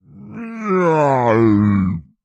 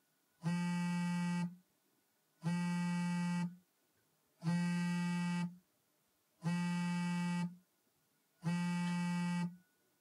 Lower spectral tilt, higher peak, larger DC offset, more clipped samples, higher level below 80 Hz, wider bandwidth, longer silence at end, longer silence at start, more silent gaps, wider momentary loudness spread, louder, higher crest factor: first, -9 dB/octave vs -6 dB/octave; first, -2 dBFS vs -26 dBFS; neither; neither; first, -50 dBFS vs under -90 dBFS; second, 8 kHz vs 11 kHz; second, 0.25 s vs 0.45 s; second, 0.15 s vs 0.4 s; neither; first, 17 LU vs 8 LU; first, -15 LUFS vs -39 LUFS; about the same, 14 dB vs 12 dB